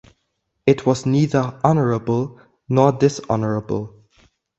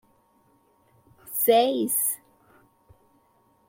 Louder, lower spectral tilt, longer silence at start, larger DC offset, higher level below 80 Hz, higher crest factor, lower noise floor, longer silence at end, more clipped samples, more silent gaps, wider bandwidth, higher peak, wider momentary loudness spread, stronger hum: first, -19 LUFS vs -23 LUFS; first, -7.5 dB/octave vs -2 dB/octave; second, 0.65 s vs 1.25 s; neither; first, -52 dBFS vs -72 dBFS; about the same, 20 dB vs 20 dB; first, -73 dBFS vs -64 dBFS; second, 0.7 s vs 1.5 s; neither; neither; second, 8.2 kHz vs 16.5 kHz; first, 0 dBFS vs -8 dBFS; second, 9 LU vs 12 LU; neither